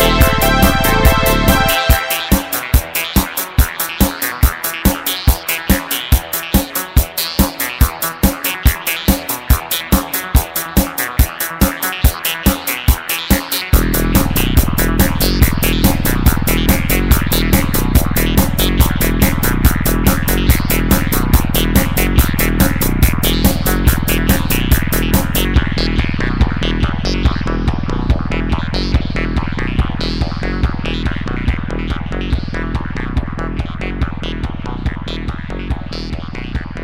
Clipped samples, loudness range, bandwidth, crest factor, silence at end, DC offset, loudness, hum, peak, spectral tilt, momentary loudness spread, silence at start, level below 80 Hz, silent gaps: under 0.1%; 7 LU; 16.5 kHz; 14 dB; 0 s; under 0.1%; -15 LUFS; none; 0 dBFS; -4.5 dB/octave; 8 LU; 0 s; -18 dBFS; none